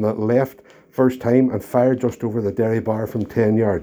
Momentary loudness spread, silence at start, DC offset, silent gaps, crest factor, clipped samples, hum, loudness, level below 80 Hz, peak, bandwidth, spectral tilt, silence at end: 6 LU; 0 s; under 0.1%; none; 18 dB; under 0.1%; none; -20 LUFS; -54 dBFS; -2 dBFS; over 20 kHz; -9 dB/octave; 0 s